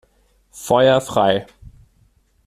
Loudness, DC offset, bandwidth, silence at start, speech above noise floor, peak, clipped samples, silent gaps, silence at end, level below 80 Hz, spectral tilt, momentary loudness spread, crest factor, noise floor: -17 LUFS; under 0.1%; 14.5 kHz; 0.55 s; 42 dB; -2 dBFS; under 0.1%; none; 1.05 s; -50 dBFS; -5 dB/octave; 9 LU; 18 dB; -59 dBFS